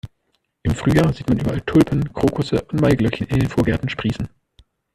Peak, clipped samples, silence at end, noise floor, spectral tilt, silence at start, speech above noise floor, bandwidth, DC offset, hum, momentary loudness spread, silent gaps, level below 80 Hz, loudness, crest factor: -2 dBFS; under 0.1%; 0.7 s; -69 dBFS; -7.5 dB/octave; 0.05 s; 51 dB; 14 kHz; under 0.1%; none; 8 LU; none; -38 dBFS; -19 LUFS; 18 dB